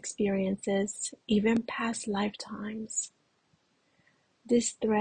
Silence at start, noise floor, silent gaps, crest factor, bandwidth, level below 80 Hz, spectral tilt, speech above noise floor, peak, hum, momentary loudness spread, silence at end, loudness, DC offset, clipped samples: 0.05 s; -71 dBFS; none; 16 dB; 10.5 kHz; -64 dBFS; -4.5 dB/octave; 41 dB; -14 dBFS; none; 10 LU; 0 s; -31 LUFS; under 0.1%; under 0.1%